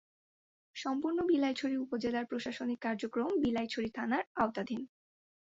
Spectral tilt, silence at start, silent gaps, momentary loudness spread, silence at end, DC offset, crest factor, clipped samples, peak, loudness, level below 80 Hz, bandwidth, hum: -5.5 dB/octave; 0.75 s; 4.27-4.35 s; 9 LU; 0.55 s; under 0.1%; 18 dB; under 0.1%; -18 dBFS; -35 LUFS; -68 dBFS; 7.8 kHz; none